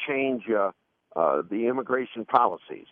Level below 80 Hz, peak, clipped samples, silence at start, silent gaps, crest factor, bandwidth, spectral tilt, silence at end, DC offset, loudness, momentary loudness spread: -76 dBFS; -4 dBFS; under 0.1%; 0 s; none; 22 dB; 4.8 kHz; -3.5 dB/octave; 0.1 s; under 0.1%; -26 LUFS; 7 LU